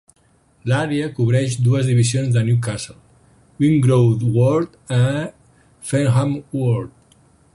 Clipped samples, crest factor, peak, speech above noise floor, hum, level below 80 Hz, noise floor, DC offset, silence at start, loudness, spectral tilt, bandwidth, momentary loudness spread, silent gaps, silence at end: under 0.1%; 14 dB; -4 dBFS; 40 dB; none; -50 dBFS; -57 dBFS; under 0.1%; 0.65 s; -18 LUFS; -7 dB/octave; 11.5 kHz; 11 LU; none; 0.7 s